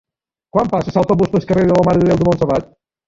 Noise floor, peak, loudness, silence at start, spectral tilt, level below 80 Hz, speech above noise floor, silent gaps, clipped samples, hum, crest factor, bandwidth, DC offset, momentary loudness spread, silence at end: -52 dBFS; -2 dBFS; -15 LUFS; 0.55 s; -8.5 dB/octave; -40 dBFS; 38 dB; none; under 0.1%; none; 14 dB; 7.8 kHz; under 0.1%; 6 LU; 0.45 s